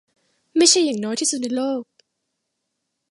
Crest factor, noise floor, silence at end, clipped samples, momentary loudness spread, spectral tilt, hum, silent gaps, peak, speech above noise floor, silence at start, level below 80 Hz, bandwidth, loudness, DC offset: 22 dB; -77 dBFS; 1.3 s; under 0.1%; 12 LU; -1.5 dB/octave; none; none; 0 dBFS; 58 dB; 0.55 s; -72 dBFS; 11.5 kHz; -19 LUFS; under 0.1%